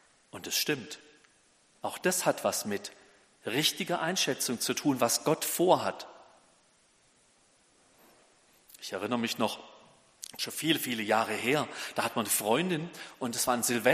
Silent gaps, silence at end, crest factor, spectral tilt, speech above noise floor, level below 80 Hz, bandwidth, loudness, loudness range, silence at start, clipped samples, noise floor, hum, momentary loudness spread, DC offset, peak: none; 0 s; 24 dB; -3 dB/octave; 36 dB; -74 dBFS; 15.5 kHz; -30 LUFS; 9 LU; 0.35 s; under 0.1%; -66 dBFS; none; 16 LU; under 0.1%; -8 dBFS